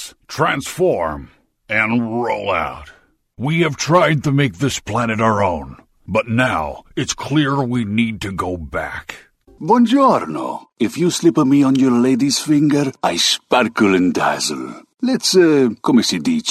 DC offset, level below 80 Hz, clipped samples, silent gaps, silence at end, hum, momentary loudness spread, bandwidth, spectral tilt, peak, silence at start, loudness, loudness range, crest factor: under 0.1%; -48 dBFS; under 0.1%; none; 0 s; none; 12 LU; 14 kHz; -4.5 dB/octave; -2 dBFS; 0 s; -17 LUFS; 5 LU; 16 dB